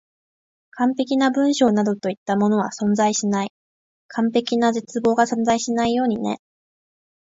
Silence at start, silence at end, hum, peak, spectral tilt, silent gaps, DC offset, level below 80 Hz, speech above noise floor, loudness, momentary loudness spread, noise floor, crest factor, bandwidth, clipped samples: 0.75 s; 0.85 s; none; -4 dBFS; -5 dB/octave; 2.17-2.26 s, 3.50-4.09 s; under 0.1%; -60 dBFS; over 70 dB; -20 LUFS; 7 LU; under -90 dBFS; 18 dB; 7.8 kHz; under 0.1%